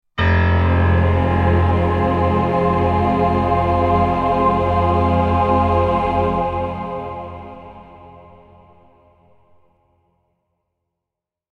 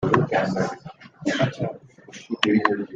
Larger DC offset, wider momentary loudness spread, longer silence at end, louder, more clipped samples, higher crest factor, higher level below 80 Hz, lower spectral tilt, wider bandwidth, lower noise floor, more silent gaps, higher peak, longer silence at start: neither; second, 11 LU vs 23 LU; first, 3.3 s vs 0 s; first, -17 LUFS vs -24 LUFS; neither; second, 14 dB vs 22 dB; first, -30 dBFS vs -56 dBFS; first, -9 dB/octave vs -6 dB/octave; second, 5.2 kHz vs 9.4 kHz; first, -85 dBFS vs -45 dBFS; neither; about the same, -4 dBFS vs -2 dBFS; first, 0.15 s vs 0 s